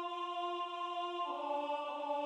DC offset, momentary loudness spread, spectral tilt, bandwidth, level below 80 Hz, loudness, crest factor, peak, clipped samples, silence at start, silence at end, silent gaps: under 0.1%; 2 LU; -1.5 dB/octave; 11 kHz; under -90 dBFS; -39 LUFS; 12 dB; -28 dBFS; under 0.1%; 0 s; 0 s; none